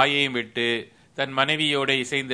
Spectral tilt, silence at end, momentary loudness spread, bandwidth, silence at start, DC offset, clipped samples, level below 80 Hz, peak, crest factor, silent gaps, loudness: -3.5 dB/octave; 0 s; 9 LU; 11 kHz; 0 s; under 0.1%; under 0.1%; -68 dBFS; -2 dBFS; 22 dB; none; -23 LUFS